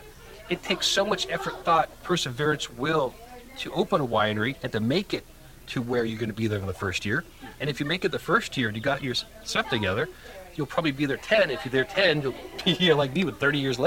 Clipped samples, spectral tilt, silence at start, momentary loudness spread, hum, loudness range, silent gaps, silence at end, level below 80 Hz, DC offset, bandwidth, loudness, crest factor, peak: under 0.1%; -4.5 dB/octave; 0 s; 10 LU; none; 4 LU; none; 0 s; -52 dBFS; under 0.1%; 17 kHz; -26 LUFS; 20 dB; -8 dBFS